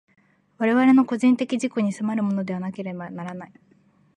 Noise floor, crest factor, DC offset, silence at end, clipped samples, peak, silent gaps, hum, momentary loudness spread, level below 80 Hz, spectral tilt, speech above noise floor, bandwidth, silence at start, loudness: -59 dBFS; 16 dB; under 0.1%; 0.7 s; under 0.1%; -8 dBFS; none; none; 16 LU; -74 dBFS; -6.5 dB/octave; 37 dB; 10 kHz; 0.6 s; -22 LUFS